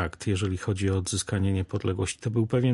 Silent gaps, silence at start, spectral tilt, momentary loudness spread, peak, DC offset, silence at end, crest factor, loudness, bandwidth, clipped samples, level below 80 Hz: none; 0 s; -5.5 dB/octave; 3 LU; -12 dBFS; under 0.1%; 0 s; 16 dB; -28 LUFS; 11.5 kHz; under 0.1%; -40 dBFS